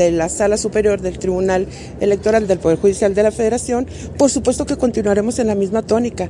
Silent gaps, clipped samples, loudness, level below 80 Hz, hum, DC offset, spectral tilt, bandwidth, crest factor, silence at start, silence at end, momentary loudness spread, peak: none; under 0.1%; -17 LUFS; -38 dBFS; none; under 0.1%; -5 dB/octave; 11.5 kHz; 14 dB; 0 s; 0 s; 5 LU; -2 dBFS